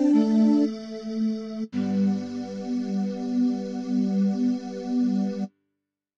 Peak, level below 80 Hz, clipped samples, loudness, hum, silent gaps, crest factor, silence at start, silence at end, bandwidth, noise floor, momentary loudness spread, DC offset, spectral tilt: -10 dBFS; -70 dBFS; under 0.1%; -26 LUFS; none; none; 14 dB; 0 s; 0.7 s; 7.6 kHz; -82 dBFS; 12 LU; under 0.1%; -8 dB/octave